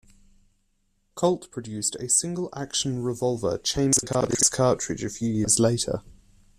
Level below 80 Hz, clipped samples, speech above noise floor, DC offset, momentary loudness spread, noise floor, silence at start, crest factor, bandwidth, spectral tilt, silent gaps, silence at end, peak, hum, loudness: -52 dBFS; under 0.1%; 44 dB; under 0.1%; 10 LU; -69 dBFS; 1.15 s; 20 dB; 14.5 kHz; -4 dB/octave; none; 0.45 s; -6 dBFS; none; -24 LUFS